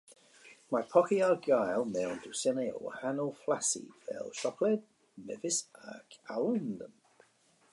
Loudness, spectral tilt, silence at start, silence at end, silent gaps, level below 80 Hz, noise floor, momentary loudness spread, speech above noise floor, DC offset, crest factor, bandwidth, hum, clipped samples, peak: -33 LUFS; -4 dB/octave; 0.1 s; 0.85 s; none; -80 dBFS; -68 dBFS; 17 LU; 35 dB; under 0.1%; 22 dB; 11.5 kHz; none; under 0.1%; -12 dBFS